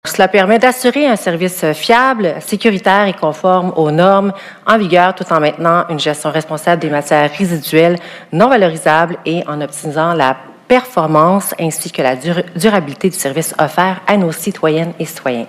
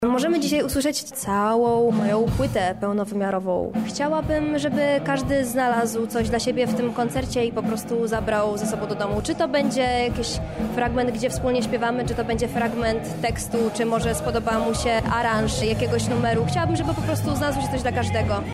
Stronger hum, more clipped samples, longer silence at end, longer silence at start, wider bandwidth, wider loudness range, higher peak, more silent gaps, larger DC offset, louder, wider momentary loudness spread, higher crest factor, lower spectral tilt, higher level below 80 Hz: neither; first, 0.5% vs under 0.1%; about the same, 0 s vs 0 s; about the same, 0.05 s vs 0 s; about the same, 16 kHz vs 16 kHz; about the same, 2 LU vs 2 LU; first, 0 dBFS vs -12 dBFS; neither; second, under 0.1% vs 0.1%; first, -13 LUFS vs -23 LUFS; first, 8 LU vs 4 LU; about the same, 12 dB vs 12 dB; about the same, -5 dB/octave vs -5.5 dB/octave; second, -56 dBFS vs -38 dBFS